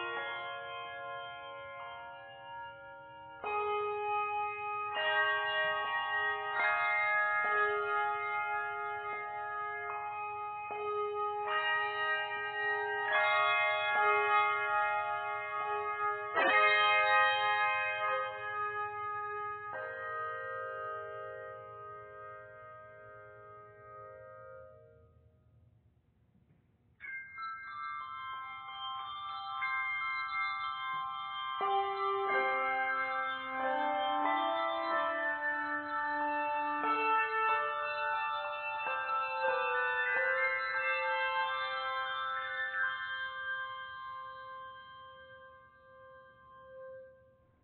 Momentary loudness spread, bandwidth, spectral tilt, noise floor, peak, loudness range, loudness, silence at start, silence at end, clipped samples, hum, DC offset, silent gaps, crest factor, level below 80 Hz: 19 LU; 4.7 kHz; 1 dB/octave; -69 dBFS; -16 dBFS; 16 LU; -33 LUFS; 0 s; 0.5 s; under 0.1%; none; under 0.1%; none; 20 dB; -76 dBFS